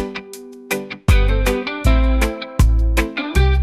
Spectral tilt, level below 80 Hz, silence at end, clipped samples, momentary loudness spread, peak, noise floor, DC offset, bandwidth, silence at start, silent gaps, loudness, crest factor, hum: -6 dB/octave; -18 dBFS; 0 s; under 0.1%; 11 LU; -2 dBFS; -36 dBFS; under 0.1%; 14.5 kHz; 0 s; none; -18 LUFS; 14 dB; none